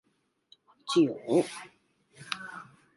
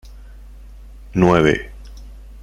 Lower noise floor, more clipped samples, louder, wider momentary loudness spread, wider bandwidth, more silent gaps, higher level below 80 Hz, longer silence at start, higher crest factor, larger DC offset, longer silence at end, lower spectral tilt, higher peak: first, -65 dBFS vs -38 dBFS; neither; second, -29 LUFS vs -17 LUFS; second, 22 LU vs 26 LU; about the same, 11.5 kHz vs 11.5 kHz; neither; second, -78 dBFS vs -36 dBFS; first, 0.85 s vs 0.05 s; about the same, 22 dB vs 20 dB; neither; first, 0.35 s vs 0 s; second, -5 dB/octave vs -7 dB/octave; second, -12 dBFS vs -2 dBFS